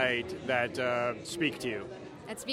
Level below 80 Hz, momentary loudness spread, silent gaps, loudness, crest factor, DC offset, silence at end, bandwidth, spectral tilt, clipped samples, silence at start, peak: -64 dBFS; 13 LU; none; -32 LUFS; 20 dB; under 0.1%; 0 s; 16.5 kHz; -4 dB/octave; under 0.1%; 0 s; -14 dBFS